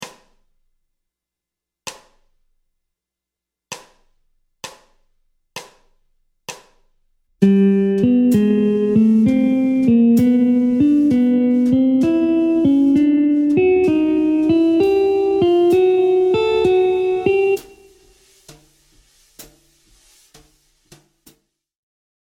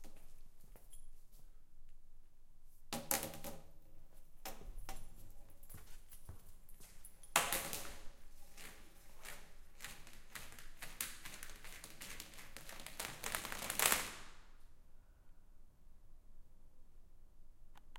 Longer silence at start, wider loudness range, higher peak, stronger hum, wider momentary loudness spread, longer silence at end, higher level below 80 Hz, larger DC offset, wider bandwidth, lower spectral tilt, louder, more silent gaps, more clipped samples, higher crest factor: about the same, 0 s vs 0 s; second, 7 LU vs 15 LU; first, 0 dBFS vs -10 dBFS; neither; second, 21 LU vs 26 LU; first, 2.8 s vs 0 s; about the same, -52 dBFS vs -56 dBFS; neither; about the same, 15.5 kHz vs 17 kHz; first, -7.5 dB/octave vs -1 dB/octave; first, -15 LUFS vs -42 LUFS; neither; neither; second, 18 dB vs 36 dB